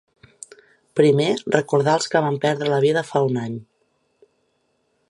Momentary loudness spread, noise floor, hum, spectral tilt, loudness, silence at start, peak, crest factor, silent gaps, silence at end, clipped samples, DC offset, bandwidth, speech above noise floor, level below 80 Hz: 22 LU; -68 dBFS; none; -5.5 dB/octave; -20 LUFS; 0.95 s; -2 dBFS; 20 dB; none; 1.45 s; under 0.1%; under 0.1%; 11.5 kHz; 49 dB; -68 dBFS